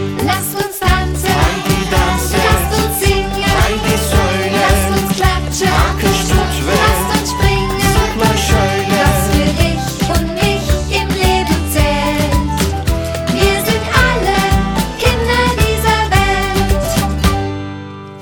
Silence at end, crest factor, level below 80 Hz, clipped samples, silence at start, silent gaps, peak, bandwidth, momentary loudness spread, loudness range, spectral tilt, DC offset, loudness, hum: 0 s; 14 dB; -20 dBFS; under 0.1%; 0 s; none; 0 dBFS; over 20 kHz; 4 LU; 1 LU; -4.5 dB/octave; under 0.1%; -14 LUFS; none